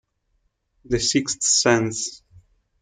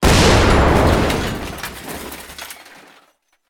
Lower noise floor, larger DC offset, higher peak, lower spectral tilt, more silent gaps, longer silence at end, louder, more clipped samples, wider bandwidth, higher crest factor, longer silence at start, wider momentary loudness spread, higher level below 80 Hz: first, -70 dBFS vs -58 dBFS; neither; second, -4 dBFS vs 0 dBFS; second, -2.5 dB/octave vs -5 dB/octave; neither; second, 0.45 s vs 0.95 s; second, -20 LUFS vs -15 LUFS; neither; second, 10.5 kHz vs 19.5 kHz; about the same, 20 dB vs 16 dB; first, 0.9 s vs 0 s; second, 11 LU vs 20 LU; second, -50 dBFS vs -24 dBFS